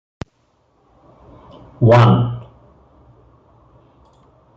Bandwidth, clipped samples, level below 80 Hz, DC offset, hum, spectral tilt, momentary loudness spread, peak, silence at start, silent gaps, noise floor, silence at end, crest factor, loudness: 6.8 kHz; under 0.1%; -48 dBFS; under 0.1%; none; -8.5 dB/octave; 26 LU; -2 dBFS; 1.8 s; none; -61 dBFS; 2.15 s; 18 dB; -13 LUFS